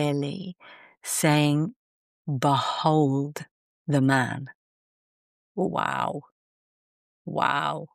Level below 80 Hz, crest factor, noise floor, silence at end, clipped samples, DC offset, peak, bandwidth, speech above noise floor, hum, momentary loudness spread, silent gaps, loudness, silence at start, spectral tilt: -70 dBFS; 20 dB; under -90 dBFS; 0.1 s; under 0.1%; under 0.1%; -8 dBFS; 14.5 kHz; over 65 dB; none; 17 LU; 1.76-2.25 s, 3.51-3.85 s, 4.55-5.55 s, 6.31-7.25 s; -25 LUFS; 0 s; -5 dB/octave